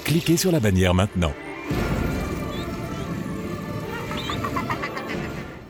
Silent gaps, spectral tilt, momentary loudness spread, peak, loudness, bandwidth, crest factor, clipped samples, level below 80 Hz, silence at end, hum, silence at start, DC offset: none; -5.5 dB/octave; 11 LU; -6 dBFS; -25 LUFS; 19.5 kHz; 20 dB; under 0.1%; -38 dBFS; 0 s; none; 0 s; under 0.1%